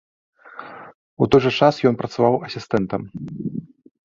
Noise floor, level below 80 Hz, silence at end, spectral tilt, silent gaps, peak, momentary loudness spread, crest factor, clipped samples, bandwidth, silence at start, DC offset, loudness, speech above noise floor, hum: -39 dBFS; -52 dBFS; 0.45 s; -7 dB/octave; 0.94-1.17 s; -2 dBFS; 22 LU; 20 dB; under 0.1%; 7.4 kHz; 0.55 s; under 0.1%; -20 LUFS; 20 dB; none